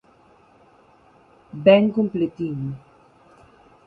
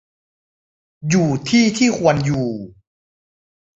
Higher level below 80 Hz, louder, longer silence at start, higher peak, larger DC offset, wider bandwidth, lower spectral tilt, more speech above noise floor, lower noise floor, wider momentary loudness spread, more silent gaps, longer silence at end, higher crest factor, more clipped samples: second, -62 dBFS vs -50 dBFS; second, -20 LUFS vs -17 LUFS; first, 1.55 s vs 1 s; about the same, -2 dBFS vs -2 dBFS; neither; second, 4.8 kHz vs 8 kHz; first, -9 dB/octave vs -5.5 dB/octave; second, 36 dB vs over 73 dB; second, -55 dBFS vs under -90 dBFS; first, 21 LU vs 11 LU; neither; about the same, 1.1 s vs 1.1 s; about the same, 22 dB vs 18 dB; neither